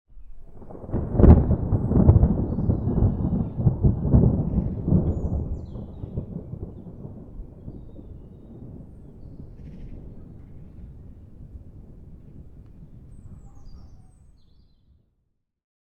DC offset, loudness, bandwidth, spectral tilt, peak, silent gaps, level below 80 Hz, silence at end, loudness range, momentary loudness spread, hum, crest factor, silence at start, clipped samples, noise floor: under 0.1%; -22 LUFS; 2.5 kHz; -13 dB/octave; 0 dBFS; none; -30 dBFS; 1.9 s; 25 LU; 27 LU; none; 24 dB; 0.15 s; under 0.1%; -73 dBFS